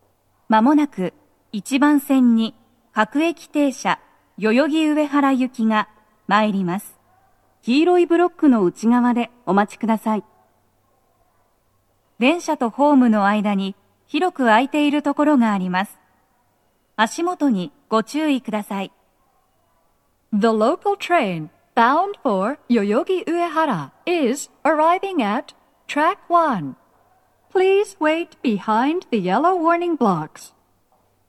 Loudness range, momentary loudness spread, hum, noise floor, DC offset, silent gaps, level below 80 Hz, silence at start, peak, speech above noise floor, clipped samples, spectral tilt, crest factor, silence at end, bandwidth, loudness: 5 LU; 10 LU; none; -64 dBFS; under 0.1%; none; -70 dBFS; 0.5 s; 0 dBFS; 46 dB; under 0.1%; -5.5 dB/octave; 20 dB; 0.8 s; 13 kHz; -19 LUFS